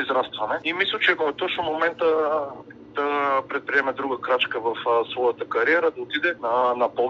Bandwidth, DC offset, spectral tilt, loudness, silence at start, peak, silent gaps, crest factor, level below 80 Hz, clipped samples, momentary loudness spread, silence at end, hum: 7 kHz; under 0.1%; -5 dB/octave; -23 LUFS; 0 s; -6 dBFS; none; 18 dB; -66 dBFS; under 0.1%; 6 LU; 0 s; none